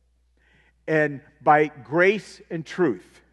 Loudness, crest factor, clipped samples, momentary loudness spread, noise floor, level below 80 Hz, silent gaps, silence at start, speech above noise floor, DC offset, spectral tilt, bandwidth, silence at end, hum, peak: -22 LUFS; 20 dB; under 0.1%; 15 LU; -63 dBFS; -64 dBFS; none; 0.85 s; 40 dB; under 0.1%; -6.5 dB/octave; 11 kHz; 0.35 s; none; -4 dBFS